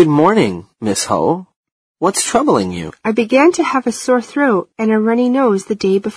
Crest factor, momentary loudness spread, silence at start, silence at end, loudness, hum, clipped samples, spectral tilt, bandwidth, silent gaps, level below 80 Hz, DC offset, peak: 14 dB; 8 LU; 0 s; 0 s; -15 LUFS; none; under 0.1%; -5 dB/octave; 14 kHz; 1.56-1.64 s, 1.72-1.95 s; -54 dBFS; under 0.1%; 0 dBFS